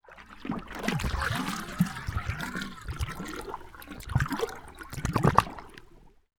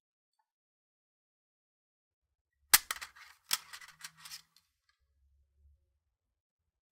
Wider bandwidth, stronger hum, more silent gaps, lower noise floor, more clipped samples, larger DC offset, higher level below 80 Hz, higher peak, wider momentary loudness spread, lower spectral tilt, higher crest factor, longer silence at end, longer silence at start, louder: first, 20 kHz vs 16 kHz; neither; neither; second, -54 dBFS vs -85 dBFS; neither; neither; first, -42 dBFS vs -70 dBFS; about the same, -2 dBFS vs -4 dBFS; second, 17 LU vs 24 LU; first, -5.5 dB/octave vs 2.5 dB/octave; second, 30 dB vs 38 dB; second, 0.3 s vs 2.55 s; second, 0.05 s vs 2.75 s; about the same, -31 LUFS vs -30 LUFS